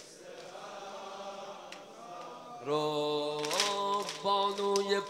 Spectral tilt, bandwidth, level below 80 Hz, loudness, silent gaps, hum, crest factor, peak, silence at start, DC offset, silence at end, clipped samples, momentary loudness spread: -2.5 dB/octave; 16 kHz; -82 dBFS; -33 LUFS; none; none; 22 dB; -12 dBFS; 0 s; under 0.1%; 0 s; under 0.1%; 17 LU